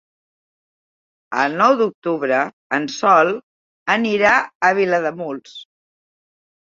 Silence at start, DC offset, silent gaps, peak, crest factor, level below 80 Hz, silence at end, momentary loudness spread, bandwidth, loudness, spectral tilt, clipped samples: 1.3 s; under 0.1%; 1.95-2.02 s, 2.53-2.70 s, 3.43-3.86 s, 4.55-4.60 s; 0 dBFS; 18 dB; -64 dBFS; 1.05 s; 14 LU; 7.6 kHz; -17 LUFS; -4.5 dB/octave; under 0.1%